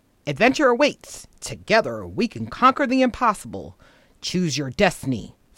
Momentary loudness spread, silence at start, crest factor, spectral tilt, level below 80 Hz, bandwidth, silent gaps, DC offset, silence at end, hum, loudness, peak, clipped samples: 17 LU; 0.25 s; 18 dB; -4.5 dB/octave; -50 dBFS; 16 kHz; none; under 0.1%; 0.3 s; none; -21 LUFS; -4 dBFS; under 0.1%